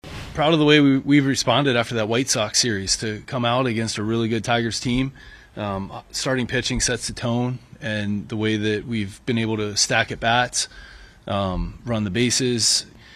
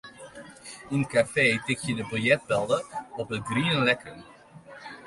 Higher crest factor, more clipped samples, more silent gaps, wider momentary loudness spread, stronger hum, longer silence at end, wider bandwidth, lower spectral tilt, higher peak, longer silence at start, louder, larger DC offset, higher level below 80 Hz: about the same, 20 dB vs 20 dB; neither; neither; second, 10 LU vs 21 LU; neither; about the same, 0 s vs 0 s; first, 15 kHz vs 11.5 kHz; second, -3.5 dB/octave vs -5 dB/octave; first, -2 dBFS vs -8 dBFS; about the same, 0.05 s vs 0.05 s; first, -21 LUFS vs -26 LUFS; neither; first, -42 dBFS vs -60 dBFS